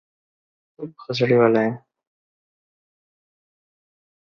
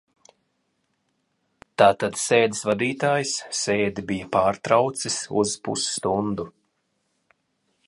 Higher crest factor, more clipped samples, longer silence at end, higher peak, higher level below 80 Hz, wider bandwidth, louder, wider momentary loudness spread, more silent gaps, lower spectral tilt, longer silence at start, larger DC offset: about the same, 22 dB vs 24 dB; neither; first, 2.45 s vs 1.4 s; about the same, -2 dBFS vs -2 dBFS; second, -68 dBFS vs -58 dBFS; second, 6.8 kHz vs 11.5 kHz; first, -19 LUFS vs -23 LUFS; first, 21 LU vs 8 LU; neither; first, -7.5 dB/octave vs -3.5 dB/octave; second, 0.8 s vs 1.8 s; neither